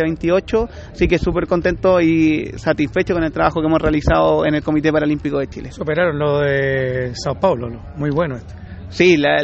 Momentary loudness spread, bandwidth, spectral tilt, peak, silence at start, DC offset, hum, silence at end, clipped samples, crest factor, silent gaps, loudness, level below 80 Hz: 10 LU; 8 kHz; -7 dB/octave; 0 dBFS; 0 s; under 0.1%; none; 0 s; under 0.1%; 16 dB; none; -17 LUFS; -34 dBFS